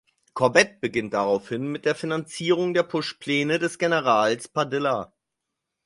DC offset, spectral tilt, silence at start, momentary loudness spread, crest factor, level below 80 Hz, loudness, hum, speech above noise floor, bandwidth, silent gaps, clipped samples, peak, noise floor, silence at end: under 0.1%; -4.5 dB/octave; 0.35 s; 9 LU; 22 dB; -64 dBFS; -24 LUFS; none; 60 dB; 11.5 kHz; none; under 0.1%; -2 dBFS; -83 dBFS; 0.8 s